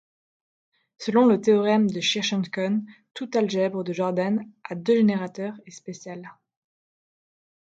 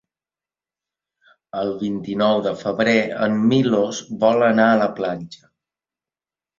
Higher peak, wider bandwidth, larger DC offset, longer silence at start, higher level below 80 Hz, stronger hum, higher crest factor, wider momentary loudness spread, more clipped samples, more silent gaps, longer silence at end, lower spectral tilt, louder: second, -8 dBFS vs -2 dBFS; about the same, 8 kHz vs 7.4 kHz; neither; second, 1 s vs 1.55 s; second, -72 dBFS vs -60 dBFS; neither; about the same, 18 dB vs 18 dB; first, 18 LU vs 11 LU; neither; first, 3.11-3.15 s vs none; about the same, 1.3 s vs 1.25 s; about the same, -5.5 dB/octave vs -6 dB/octave; second, -23 LUFS vs -19 LUFS